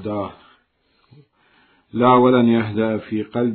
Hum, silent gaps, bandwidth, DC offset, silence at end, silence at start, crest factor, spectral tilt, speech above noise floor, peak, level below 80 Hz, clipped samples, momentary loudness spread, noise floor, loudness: none; none; 4.4 kHz; under 0.1%; 0 s; 0 s; 18 dB; -11.5 dB/octave; 46 dB; -2 dBFS; -62 dBFS; under 0.1%; 15 LU; -63 dBFS; -17 LUFS